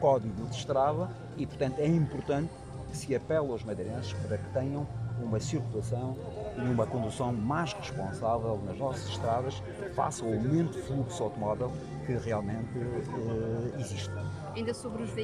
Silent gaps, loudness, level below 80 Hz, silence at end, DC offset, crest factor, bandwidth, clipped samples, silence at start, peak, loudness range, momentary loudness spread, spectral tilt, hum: none; -33 LUFS; -54 dBFS; 0 s; under 0.1%; 18 dB; 12 kHz; under 0.1%; 0 s; -14 dBFS; 2 LU; 8 LU; -6.5 dB/octave; none